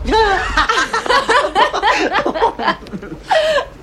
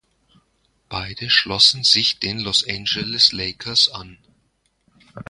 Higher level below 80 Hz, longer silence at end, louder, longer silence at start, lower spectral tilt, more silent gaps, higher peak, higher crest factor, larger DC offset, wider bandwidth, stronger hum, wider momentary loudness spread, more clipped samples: first, -32 dBFS vs -50 dBFS; about the same, 0 s vs 0.05 s; about the same, -15 LUFS vs -16 LUFS; second, 0 s vs 0.9 s; first, -3 dB/octave vs -1.5 dB/octave; neither; about the same, 0 dBFS vs 0 dBFS; second, 14 dB vs 22 dB; neither; first, 13 kHz vs 11.5 kHz; neither; second, 7 LU vs 16 LU; neither